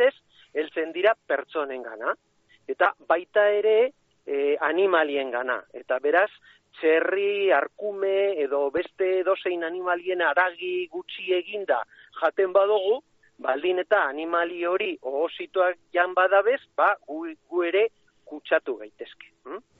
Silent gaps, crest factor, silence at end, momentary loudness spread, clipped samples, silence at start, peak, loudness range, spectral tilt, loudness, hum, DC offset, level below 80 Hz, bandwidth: none; 18 dB; 0.2 s; 11 LU; under 0.1%; 0 s; -8 dBFS; 2 LU; 0 dB/octave; -25 LUFS; none; under 0.1%; -74 dBFS; 4.5 kHz